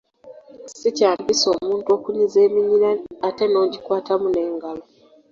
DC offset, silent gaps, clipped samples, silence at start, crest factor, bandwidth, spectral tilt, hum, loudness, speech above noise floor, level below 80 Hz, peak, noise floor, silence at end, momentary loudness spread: under 0.1%; none; under 0.1%; 0.25 s; 16 dB; 7.6 kHz; -3.5 dB/octave; none; -20 LUFS; 25 dB; -62 dBFS; -4 dBFS; -44 dBFS; 0.5 s; 10 LU